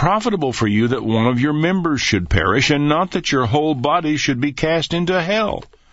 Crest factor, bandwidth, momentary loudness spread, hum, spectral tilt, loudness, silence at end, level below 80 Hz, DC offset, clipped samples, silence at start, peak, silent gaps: 16 dB; 8 kHz; 4 LU; none; -5.5 dB/octave; -17 LUFS; 0.3 s; -38 dBFS; under 0.1%; under 0.1%; 0 s; -2 dBFS; none